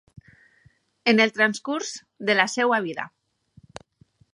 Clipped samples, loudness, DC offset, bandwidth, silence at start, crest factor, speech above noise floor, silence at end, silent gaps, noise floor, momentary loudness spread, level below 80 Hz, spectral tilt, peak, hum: under 0.1%; -22 LUFS; under 0.1%; 11 kHz; 1.05 s; 24 dB; 38 dB; 1.25 s; none; -61 dBFS; 14 LU; -68 dBFS; -3.5 dB/octave; -2 dBFS; none